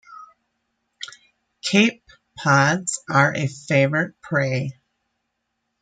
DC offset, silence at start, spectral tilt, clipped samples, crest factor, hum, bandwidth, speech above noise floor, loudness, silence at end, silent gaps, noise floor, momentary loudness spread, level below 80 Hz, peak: under 0.1%; 0.1 s; -4.5 dB/octave; under 0.1%; 20 dB; none; 9.4 kHz; 57 dB; -20 LUFS; 1.1 s; none; -76 dBFS; 18 LU; -64 dBFS; -2 dBFS